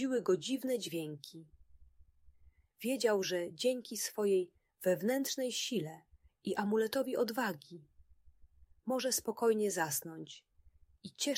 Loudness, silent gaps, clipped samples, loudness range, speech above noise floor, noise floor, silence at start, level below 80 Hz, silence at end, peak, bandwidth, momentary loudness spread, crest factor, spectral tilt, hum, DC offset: -35 LUFS; none; under 0.1%; 3 LU; 30 dB; -65 dBFS; 0 s; -72 dBFS; 0 s; -20 dBFS; 16 kHz; 16 LU; 18 dB; -3.5 dB/octave; none; under 0.1%